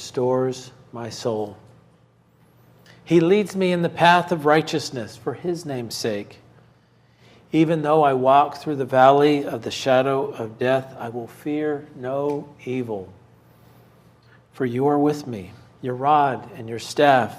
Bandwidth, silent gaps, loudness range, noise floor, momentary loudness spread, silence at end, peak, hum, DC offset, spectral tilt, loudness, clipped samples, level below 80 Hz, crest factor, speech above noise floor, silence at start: 15.5 kHz; none; 9 LU; -57 dBFS; 16 LU; 0 s; -2 dBFS; none; under 0.1%; -6 dB/octave; -21 LUFS; under 0.1%; -66 dBFS; 20 dB; 36 dB; 0 s